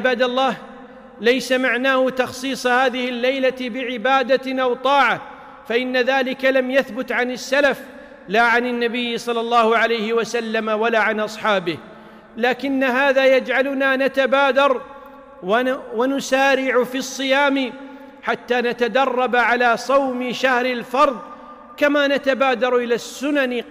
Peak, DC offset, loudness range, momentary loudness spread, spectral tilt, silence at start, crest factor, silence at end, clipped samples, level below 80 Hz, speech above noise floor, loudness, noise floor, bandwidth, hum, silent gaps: -6 dBFS; under 0.1%; 2 LU; 9 LU; -3.5 dB/octave; 0 s; 12 dB; 0 s; under 0.1%; -60 dBFS; 20 dB; -19 LUFS; -39 dBFS; 16 kHz; none; none